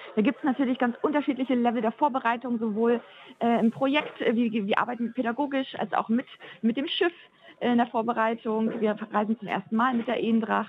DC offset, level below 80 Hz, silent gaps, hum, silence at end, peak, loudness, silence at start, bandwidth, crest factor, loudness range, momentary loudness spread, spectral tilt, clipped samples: under 0.1%; -78 dBFS; none; none; 0 s; -8 dBFS; -27 LUFS; 0 s; 5.2 kHz; 18 dB; 2 LU; 5 LU; -7.5 dB/octave; under 0.1%